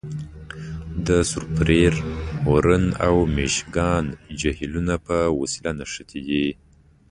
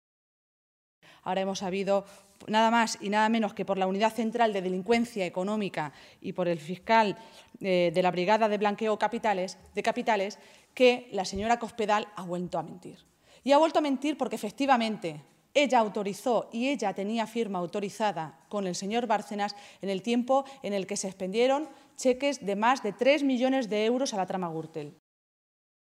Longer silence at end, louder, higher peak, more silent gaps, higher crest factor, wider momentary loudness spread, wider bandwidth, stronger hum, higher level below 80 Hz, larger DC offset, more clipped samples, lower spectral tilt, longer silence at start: second, 0.55 s vs 1.1 s; first, -22 LUFS vs -28 LUFS; first, -4 dBFS vs -10 dBFS; neither; about the same, 18 dB vs 20 dB; about the same, 14 LU vs 12 LU; second, 11 kHz vs 15.5 kHz; neither; first, -34 dBFS vs -66 dBFS; neither; neither; about the same, -5.5 dB/octave vs -4.5 dB/octave; second, 0.05 s vs 1.25 s